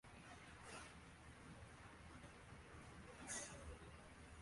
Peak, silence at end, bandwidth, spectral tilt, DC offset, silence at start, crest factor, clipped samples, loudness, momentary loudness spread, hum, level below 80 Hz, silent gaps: -38 dBFS; 0 s; 11.5 kHz; -3 dB/octave; under 0.1%; 0.05 s; 22 dB; under 0.1%; -57 LUFS; 11 LU; none; -66 dBFS; none